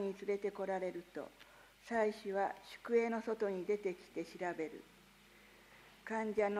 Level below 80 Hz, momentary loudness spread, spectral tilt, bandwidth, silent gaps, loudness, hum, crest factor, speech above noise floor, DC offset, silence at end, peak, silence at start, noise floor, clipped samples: -76 dBFS; 21 LU; -6 dB/octave; 15.5 kHz; none; -40 LUFS; 50 Hz at -75 dBFS; 18 dB; 25 dB; under 0.1%; 0 s; -22 dBFS; 0 s; -64 dBFS; under 0.1%